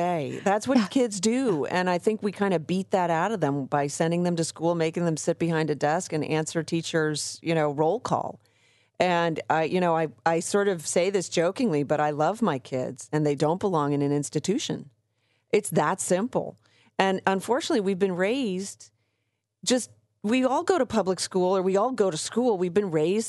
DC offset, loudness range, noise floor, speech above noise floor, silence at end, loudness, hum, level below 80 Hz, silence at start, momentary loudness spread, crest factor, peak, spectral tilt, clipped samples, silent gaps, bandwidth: under 0.1%; 2 LU; -78 dBFS; 53 dB; 0 s; -26 LUFS; none; -70 dBFS; 0 s; 5 LU; 18 dB; -6 dBFS; -5 dB/octave; under 0.1%; none; 12 kHz